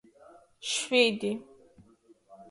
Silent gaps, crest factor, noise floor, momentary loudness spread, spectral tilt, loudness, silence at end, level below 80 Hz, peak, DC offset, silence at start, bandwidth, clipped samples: none; 24 dB; -61 dBFS; 16 LU; -2.5 dB/octave; -28 LUFS; 0.05 s; -74 dBFS; -8 dBFS; under 0.1%; 0.6 s; 11.5 kHz; under 0.1%